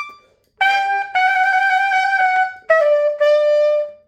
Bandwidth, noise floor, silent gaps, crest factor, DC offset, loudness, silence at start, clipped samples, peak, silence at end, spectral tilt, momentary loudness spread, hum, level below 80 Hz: 9.2 kHz; -48 dBFS; none; 14 dB; under 0.1%; -15 LUFS; 0 s; under 0.1%; -2 dBFS; 0.15 s; 0 dB/octave; 4 LU; none; -70 dBFS